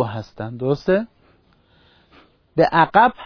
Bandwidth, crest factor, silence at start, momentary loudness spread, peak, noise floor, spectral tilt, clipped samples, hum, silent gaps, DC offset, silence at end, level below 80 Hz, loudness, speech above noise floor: 5.4 kHz; 20 dB; 0 s; 16 LU; 0 dBFS; -57 dBFS; -7.5 dB/octave; under 0.1%; none; none; under 0.1%; 0 s; -52 dBFS; -19 LUFS; 39 dB